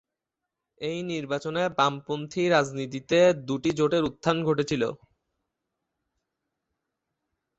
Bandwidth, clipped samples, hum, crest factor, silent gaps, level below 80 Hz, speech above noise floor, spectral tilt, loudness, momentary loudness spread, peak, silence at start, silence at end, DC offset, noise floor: 8.2 kHz; under 0.1%; none; 20 dB; none; -62 dBFS; 61 dB; -5.5 dB/octave; -26 LUFS; 11 LU; -8 dBFS; 0.8 s; 2.65 s; under 0.1%; -86 dBFS